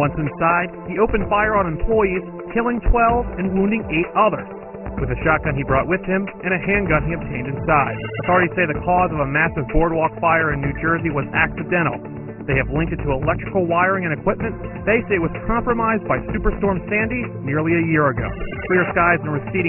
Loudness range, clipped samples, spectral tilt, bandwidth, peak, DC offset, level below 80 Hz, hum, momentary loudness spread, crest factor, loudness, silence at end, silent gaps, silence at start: 2 LU; under 0.1%; -11.5 dB/octave; 3.4 kHz; -2 dBFS; under 0.1%; -32 dBFS; none; 8 LU; 18 dB; -19 LUFS; 0 s; none; 0 s